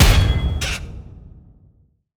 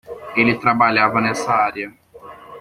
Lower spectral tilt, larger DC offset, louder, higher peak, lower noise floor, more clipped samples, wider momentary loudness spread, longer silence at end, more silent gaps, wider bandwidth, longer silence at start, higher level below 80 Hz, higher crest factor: about the same, -4.5 dB/octave vs -5 dB/octave; neither; second, -20 LUFS vs -17 LUFS; about the same, 0 dBFS vs -2 dBFS; first, -56 dBFS vs -40 dBFS; neither; first, 23 LU vs 10 LU; first, 0.9 s vs 0 s; neither; first, over 20 kHz vs 14.5 kHz; about the same, 0 s vs 0.1 s; first, -22 dBFS vs -56 dBFS; about the same, 18 dB vs 18 dB